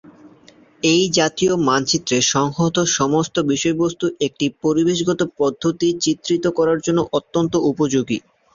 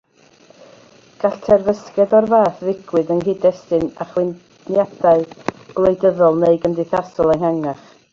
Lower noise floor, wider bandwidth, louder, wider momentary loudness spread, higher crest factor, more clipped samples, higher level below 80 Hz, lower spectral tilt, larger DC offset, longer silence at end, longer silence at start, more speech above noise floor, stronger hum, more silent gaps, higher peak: about the same, -49 dBFS vs -50 dBFS; about the same, 7.6 kHz vs 7.4 kHz; about the same, -18 LUFS vs -17 LUFS; second, 5 LU vs 10 LU; about the same, 16 dB vs 16 dB; neither; about the same, -54 dBFS vs -50 dBFS; second, -4 dB/octave vs -8 dB/octave; neither; about the same, 0.35 s vs 0.4 s; second, 0.25 s vs 1.2 s; about the same, 31 dB vs 34 dB; neither; neither; second, -4 dBFS vs 0 dBFS